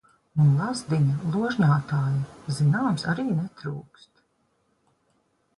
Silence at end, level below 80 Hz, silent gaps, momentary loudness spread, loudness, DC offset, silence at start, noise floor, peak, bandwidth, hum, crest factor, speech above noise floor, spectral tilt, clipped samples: 1.75 s; -60 dBFS; none; 11 LU; -25 LUFS; under 0.1%; 0.35 s; -70 dBFS; -10 dBFS; 11.5 kHz; none; 16 dB; 46 dB; -7 dB/octave; under 0.1%